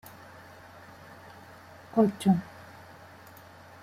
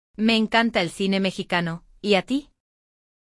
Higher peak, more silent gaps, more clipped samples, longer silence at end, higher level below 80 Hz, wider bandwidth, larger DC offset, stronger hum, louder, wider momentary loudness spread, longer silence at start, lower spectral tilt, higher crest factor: second, -12 dBFS vs -6 dBFS; neither; neither; first, 1.4 s vs 0.85 s; second, -68 dBFS vs -56 dBFS; first, 15.5 kHz vs 12 kHz; neither; neither; second, -27 LUFS vs -23 LUFS; first, 24 LU vs 9 LU; first, 1.95 s vs 0.2 s; first, -7.5 dB/octave vs -5 dB/octave; about the same, 22 dB vs 18 dB